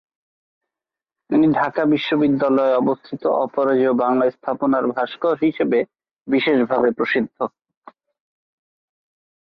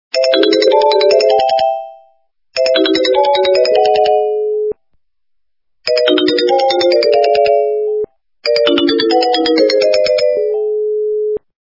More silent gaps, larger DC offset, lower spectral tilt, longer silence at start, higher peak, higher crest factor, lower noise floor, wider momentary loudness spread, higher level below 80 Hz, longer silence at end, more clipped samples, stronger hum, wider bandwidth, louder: neither; neither; first, -8.5 dB/octave vs -3 dB/octave; first, 1.3 s vs 0.15 s; second, -6 dBFS vs 0 dBFS; about the same, 14 dB vs 12 dB; first, -88 dBFS vs -72 dBFS; about the same, 6 LU vs 8 LU; second, -62 dBFS vs -56 dBFS; first, 2.05 s vs 0.25 s; neither; neither; about the same, 5.8 kHz vs 5.8 kHz; second, -19 LUFS vs -12 LUFS